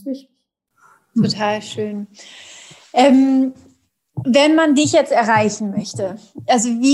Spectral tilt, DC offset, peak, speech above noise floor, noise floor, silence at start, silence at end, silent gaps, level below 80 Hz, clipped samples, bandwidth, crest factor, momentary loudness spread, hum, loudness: -4.5 dB/octave; under 0.1%; -2 dBFS; 54 dB; -70 dBFS; 0.05 s; 0 s; none; -64 dBFS; under 0.1%; 12 kHz; 16 dB; 20 LU; none; -16 LUFS